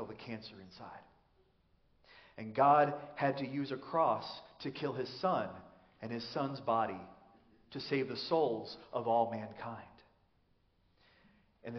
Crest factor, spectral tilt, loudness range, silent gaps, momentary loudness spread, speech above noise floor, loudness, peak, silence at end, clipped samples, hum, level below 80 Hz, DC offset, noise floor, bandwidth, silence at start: 20 dB; -4 dB/octave; 5 LU; none; 20 LU; 38 dB; -35 LUFS; -16 dBFS; 0 s; under 0.1%; none; -76 dBFS; under 0.1%; -73 dBFS; 6.4 kHz; 0 s